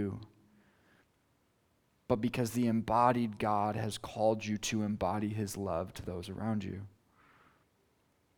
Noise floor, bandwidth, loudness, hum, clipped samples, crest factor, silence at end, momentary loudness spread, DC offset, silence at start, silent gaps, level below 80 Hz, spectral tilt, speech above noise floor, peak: -73 dBFS; 19 kHz; -34 LUFS; none; under 0.1%; 22 dB; 1.5 s; 12 LU; under 0.1%; 0 s; none; -62 dBFS; -6 dB/octave; 40 dB; -12 dBFS